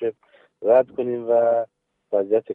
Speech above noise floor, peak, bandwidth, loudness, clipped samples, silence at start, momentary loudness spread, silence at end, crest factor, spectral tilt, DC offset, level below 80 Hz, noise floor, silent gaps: 37 dB; -6 dBFS; 3.7 kHz; -21 LUFS; under 0.1%; 0 s; 10 LU; 0 s; 16 dB; -9 dB/octave; under 0.1%; -74 dBFS; -57 dBFS; none